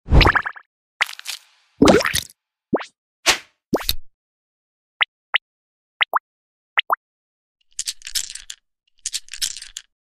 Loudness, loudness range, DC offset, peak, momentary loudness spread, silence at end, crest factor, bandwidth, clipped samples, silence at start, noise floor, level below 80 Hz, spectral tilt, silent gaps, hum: -21 LUFS; 6 LU; under 0.1%; 0 dBFS; 19 LU; 0.25 s; 22 dB; 16 kHz; under 0.1%; 0.05 s; -48 dBFS; -30 dBFS; -3.5 dB/octave; 0.66-1.00 s, 2.98-3.23 s, 3.66-3.70 s, 4.14-5.00 s, 5.08-5.33 s, 5.42-6.00 s, 6.20-6.76 s, 6.97-7.55 s; none